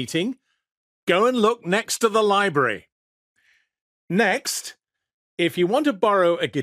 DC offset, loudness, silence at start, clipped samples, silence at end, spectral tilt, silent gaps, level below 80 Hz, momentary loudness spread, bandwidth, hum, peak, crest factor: under 0.1%; -21 LUFS; 0 s; under 0.1%; 0 s; -4 dB/octave; 0.77-1.07 s, 2.92-3.35 s, 3.81-4.08 s, 5.13-5.37 s; -70 dBFS; 11 LU; 15.5 kHz; none; -4 dBFS; 18 dB